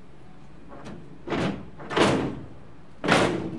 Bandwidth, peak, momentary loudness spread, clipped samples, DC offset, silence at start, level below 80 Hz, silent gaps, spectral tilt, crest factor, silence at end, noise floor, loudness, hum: 11.5 kHz; -6 dBFS; 21 LU; under 0.1%; 0.8%; 0.2 s; -52 dBFS; none; -5 dB/octave; 22 dB; 0 s; -49 dBFS; -25 LUFS; none